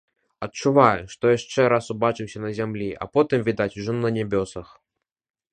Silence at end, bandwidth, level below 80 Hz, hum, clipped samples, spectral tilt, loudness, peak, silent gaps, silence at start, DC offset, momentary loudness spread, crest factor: 0.9 s; 9.6 kHz; -54 dBFS; none; under 0.1%; -6 dB/octave; -23 LUFS; 0 dBFS; none; 0.4 s; under 0.1%; 12 LU; 22 dB